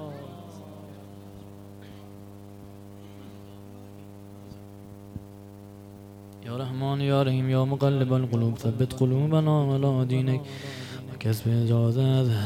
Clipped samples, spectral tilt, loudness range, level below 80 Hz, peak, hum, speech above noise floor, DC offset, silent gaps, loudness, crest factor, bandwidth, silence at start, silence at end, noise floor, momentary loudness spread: under 0.1%; -8 dB/octave; 21 LU; -60 dBFS; -10 dBFS; none; 21 dB; under 0.1%; none; -25 LUFS; 16 dB; 15 kHz; 0 s; 0 s; -45 dBFS; 23 LU